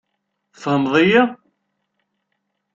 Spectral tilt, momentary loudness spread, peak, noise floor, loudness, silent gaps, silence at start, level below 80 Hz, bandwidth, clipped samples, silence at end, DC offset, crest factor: -6.5 dB/octave; 9 LU; -2 dBFS; -74 dBFS; -16 LUFS; none; 0.6 s; -62 dBFS; 7.6 kHz; under 0.1%; 1.4 s; under 0.1%; 18 dB